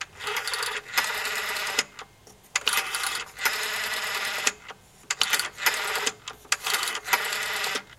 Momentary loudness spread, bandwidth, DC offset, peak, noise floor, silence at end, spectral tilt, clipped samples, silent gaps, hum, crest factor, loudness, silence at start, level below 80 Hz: 6 LU; 17 kHz; under 0.1%; -2 dBFS; -53 dBFS; 0.05 s; 1.5 dB/octave; under 0.1%; none; none; 28 dB; -26 LUFS; 0 s; -64 dBFS